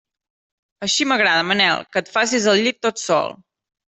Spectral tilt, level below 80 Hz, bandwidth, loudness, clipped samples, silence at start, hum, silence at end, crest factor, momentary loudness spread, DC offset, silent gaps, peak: -2.5 dB/octave; -66 dBFS; 8.4 kHz; -18 LUFS; under 0.1%; 0.8 s; none; 0.65 s; 16 dB; 7 LU; under 0.1%; none; -4 dBFS